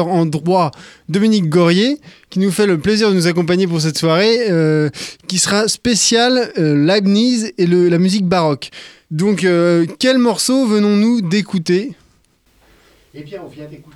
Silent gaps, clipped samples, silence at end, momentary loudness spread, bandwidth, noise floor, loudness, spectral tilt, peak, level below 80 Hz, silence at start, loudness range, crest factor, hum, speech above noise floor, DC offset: none; under 0.1%; 0.15 s; 11 LU; 14.5 kHz; -56 dBFS; -14 LUFS; -5 dB/octave; 0 dBFS; -52 dBFS; 0 s; 2 LU; 14 dB; none; 41 dB; under 0.1%